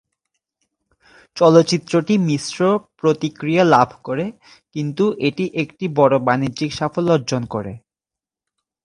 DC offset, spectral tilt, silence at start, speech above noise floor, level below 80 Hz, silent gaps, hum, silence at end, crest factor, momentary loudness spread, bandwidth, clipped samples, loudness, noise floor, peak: under 0.1%; -6 dB/octave; 1.35 s; 71 dB; -56 dBFS; none; none; 1.05 s; 18 dB; 13 LU; 11 kHz; under 0.1%; -18 LUFS; -89 dBFS; 0 dBFS